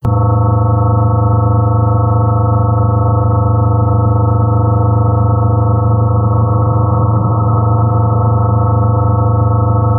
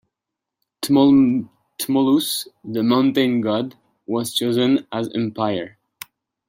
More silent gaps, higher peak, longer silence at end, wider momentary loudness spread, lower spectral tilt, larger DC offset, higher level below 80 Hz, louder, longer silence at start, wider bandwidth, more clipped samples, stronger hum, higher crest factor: neither; about the same, -4 dBFS vs -4 dBFS; second, 0 s vs 0.8 s; second, 1 LU vs 19 LU; first, -14 dB/octave vs -5 dB/octave; first, 0.3% vs under 0.1%; first, -28 dBFS vs -62 dBFS; first, -12 LUFS vs -19 LUFS; second, 0.05 s vs 0.8 s; second, 1.6 kHz vs 16.5 kHz; neither; neither; second, 6 dB vs 16 dB